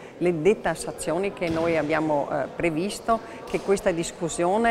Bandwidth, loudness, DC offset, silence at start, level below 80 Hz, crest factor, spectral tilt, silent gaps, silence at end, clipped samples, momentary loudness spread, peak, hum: 15.5 kHz; -25 LUFS; under 0.1%; 0 s; -50 dBFS; 16 dB; -5 dB/octave; none; 0 s; under 0.1%; 6 LU; -8 dBFS; none